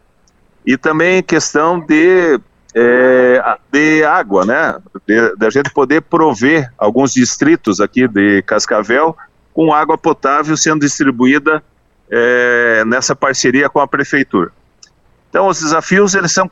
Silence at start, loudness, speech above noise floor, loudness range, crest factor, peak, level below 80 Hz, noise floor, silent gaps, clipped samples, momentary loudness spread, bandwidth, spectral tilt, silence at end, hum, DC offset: 0.65 s; -12 LUFS; 41 dB; 2 LU; 12 dB; 0 dBFS; -52 dBFS; -52 dBFS; none; under 0.1%; 6 LU; 8.2 kHz; -4 dB/octave; 0.05 s; none; under 0.1%